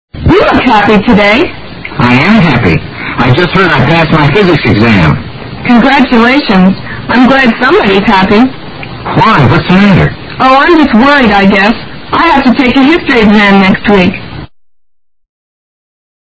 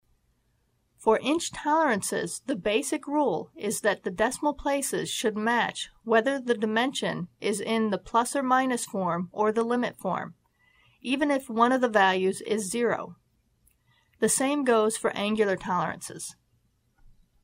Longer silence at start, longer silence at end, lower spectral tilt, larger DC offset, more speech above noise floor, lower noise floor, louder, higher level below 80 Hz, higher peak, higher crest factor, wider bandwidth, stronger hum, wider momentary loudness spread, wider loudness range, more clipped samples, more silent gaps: second, 0.15 s vs 1 s; first, 1.85 s vs 1.1 s; first, -7.5 dB/octave vs -3.5 dB/octave; neither; second, 23 dB vs 44 dB; second, -28 dBFS vs -71 dBFS; first, -6 LUFS vs -27 LUFS; first, -28 dBFS vs -60 dBFS; first, 0 dBFS vs -8 dBFS; second, 6 dB vs 20 dB; second, 8 kHz vs 16 kHz; neither; about the same, 10 LU vs 8 LU; about the same, 2 LU vs 2 LU; first, 4% vs under 0.1%; neither